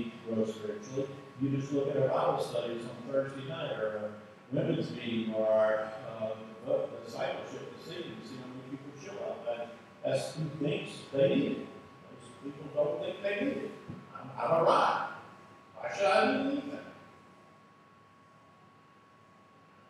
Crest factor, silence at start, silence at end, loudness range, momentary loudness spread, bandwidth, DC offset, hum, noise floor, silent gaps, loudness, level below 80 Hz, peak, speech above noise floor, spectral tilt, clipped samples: 22 dB; 0 s; 2.45 s; 8 LU; 18 LU; 12.5 kHz; under 0.1%; none; -60 dBFS; none; -33 LUFS; -80 dBFS; -12 dBFS; 27 dB; -6 dB/octave; under 0.1%